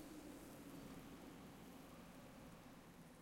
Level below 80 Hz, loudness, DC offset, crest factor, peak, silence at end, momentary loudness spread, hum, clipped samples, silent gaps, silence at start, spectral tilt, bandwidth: -72 dBFS; -59 LUFS; under 0.1%; 14 dB; -44 dBFS; 0 s; 4 LU; none; under 0.1%; none; 0 s; -5 dB/octave; 16.5 kHz